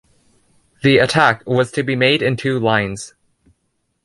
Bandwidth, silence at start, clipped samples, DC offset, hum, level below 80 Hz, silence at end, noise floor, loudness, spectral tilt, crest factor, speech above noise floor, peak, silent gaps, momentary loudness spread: 11.5 kHz; 0.85 s; under 0.1%; under 0.1%; none; -52 dBFS; 0.95 s; -69 dBFS; -16 LUFS; -5.5 dB/octave; 18 dB; 53 dB; 0 dBFS; none; 9 LU